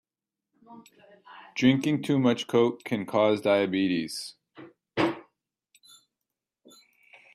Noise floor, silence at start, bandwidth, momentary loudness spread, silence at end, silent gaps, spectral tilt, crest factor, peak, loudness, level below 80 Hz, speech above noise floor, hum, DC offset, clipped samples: -89 dBFS; 0.7 s; 14 kHz; 13 LU; 2.1 s; none; -6 dB/octave; 20 dB; -8 dBFS; -26 LUFS; -70 dBFS; 63 dB; none; under 0.1%; under 0.1%